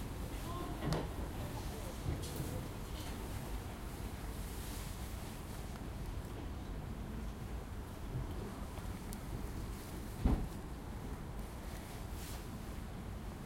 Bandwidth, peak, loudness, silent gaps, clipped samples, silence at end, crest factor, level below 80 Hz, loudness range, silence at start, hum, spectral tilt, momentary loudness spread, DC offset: 16.5 kHz; -18 dBFS; -44 LUFS; none; under 0.1%; 0 s; 24 dB; -46 dBFS; 3 LU; 0 s; none; -5.5 dB/octave; 7 LU; under 0.1%